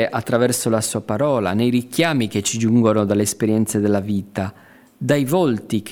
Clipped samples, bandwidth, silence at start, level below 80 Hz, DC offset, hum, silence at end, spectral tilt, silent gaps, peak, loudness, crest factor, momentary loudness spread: under 0.1%; 18 kHz; 0 s; -58 dBFS; under 0.1%; none; 0 s; -5 dB/octave; none; -2 dBFS; -19 LUFS; 16 dB; 7 LU